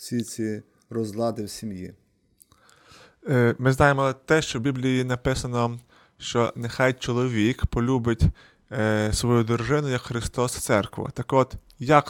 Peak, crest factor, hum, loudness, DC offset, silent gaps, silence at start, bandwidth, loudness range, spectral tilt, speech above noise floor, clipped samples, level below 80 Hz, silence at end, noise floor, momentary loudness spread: -2 dBFS; 22 dB; none; -24 LUFS; under 0.1%; none; 0 s; 17 kHz; 3 LU; -5.5 dB/octave; 37 dB; under 0.1%; -40 dBFS; 0 s; -61 dBFS; 13 LU